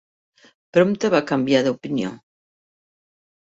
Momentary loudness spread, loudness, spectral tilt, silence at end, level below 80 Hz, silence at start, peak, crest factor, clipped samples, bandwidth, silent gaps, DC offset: 8 LU; -20 LUFS; -6 dB/octave; 1.25 s; -64 dBFS; 0.75 s; -4 dBFS; 20 dB; under 0.1%; 8 kHz; none; under 0.1%